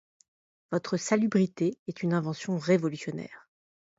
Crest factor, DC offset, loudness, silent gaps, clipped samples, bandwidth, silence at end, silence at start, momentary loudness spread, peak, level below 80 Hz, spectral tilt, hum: 18 dB; under 0.1%; -29 LUFS; 1.79-1.86 s; under 0.1%; 8 kHz; 0.6 s; 0.7 s; 11 LU; -12 dBFS; -72 dBFS; -6 dB/octave; none